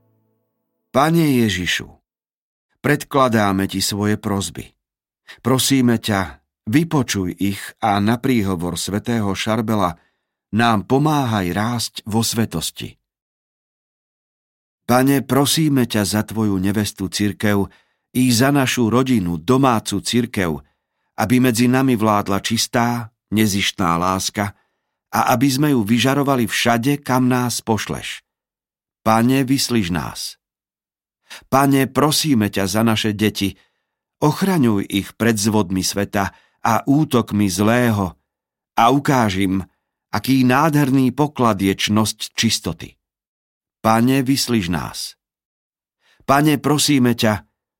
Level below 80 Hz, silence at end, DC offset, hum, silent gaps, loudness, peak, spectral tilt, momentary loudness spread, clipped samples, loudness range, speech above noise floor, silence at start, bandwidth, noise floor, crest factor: -52 dBFS; 0.4 s; under 0.1%; none; 2.36-2.69 s, 13.22-14.78 s, 43.27-43.61 s, 45.45-45.70 s; -18 LUFS; -2 dBFS; -5 dB/octave; 9 LU; under 0.1%; 3 LU; over 73 dB; 0.95 s; 16.5 kHz; under -90 dBFS; 16 dB